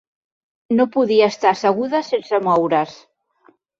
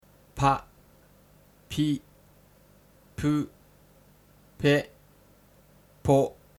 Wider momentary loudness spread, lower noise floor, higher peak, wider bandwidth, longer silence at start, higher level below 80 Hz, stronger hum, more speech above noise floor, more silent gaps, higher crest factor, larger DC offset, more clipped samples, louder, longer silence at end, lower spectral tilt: second, 6 LU vs 16 LU; about the same, -56 dBFS vs -58 dBFS; first, -2 dBFS vs -8 dBFS; second, 7.6 kHz vs 20 kHz; first, 0.7 s vs 0.35 s; second, -66 dBFS vs -54 dBFS; second, none vs 50 Hz at -55 dBFS; first, 39 dB vs 34 dB; neither; second, 16 dB vs 24 dB; neither; neither; first, -18 LUFS vs -27 LUFS; first, 0.85 s vs 0.25 s; about the same, -5.5 dB/octave vs -6.5 dB/octave